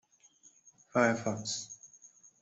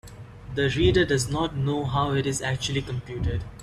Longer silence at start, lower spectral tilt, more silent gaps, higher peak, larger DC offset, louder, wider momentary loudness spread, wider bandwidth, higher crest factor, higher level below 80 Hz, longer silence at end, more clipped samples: first, 0.45 s vs 0.05 s; about the same, -4 dB/octave vs -5 dB/octave; neither; second, -14 dBFS vs -8 dBFS; neither; second, -32 LUFS vs -25 LUFS; first, 20 LU vs 12 LU; second, 8.2 kHz vs 13.5 kHz; about the same, 22 dB vs 18 dB; second, -74 dBFS vs -40 dBFS; first, 0.35 s vs 0 s; neither